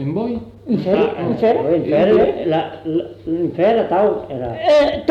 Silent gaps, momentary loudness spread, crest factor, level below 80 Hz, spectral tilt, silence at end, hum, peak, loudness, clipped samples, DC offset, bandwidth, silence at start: none; 9 LU; 12 dB; -46 dBFS; -7.5 dB/octave; 0 s; none; -4 dBFS; -17 LUFS; under 0.1%; under 0.1%; 8.2 kHz; 0 s